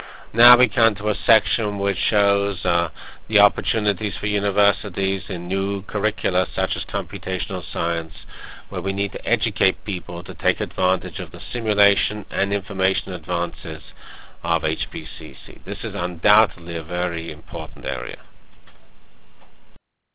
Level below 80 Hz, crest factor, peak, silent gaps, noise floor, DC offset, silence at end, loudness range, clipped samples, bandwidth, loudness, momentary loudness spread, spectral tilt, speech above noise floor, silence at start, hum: -42 dBFS; 24 dB; 0 dBFS; none; -50 dBFS; 2%; 0 s; 5 LU; under 0.1%; 4 kHz; -21 LUFS; 15 LU; -8.5 dB/octave; 28 dB; 0 s; none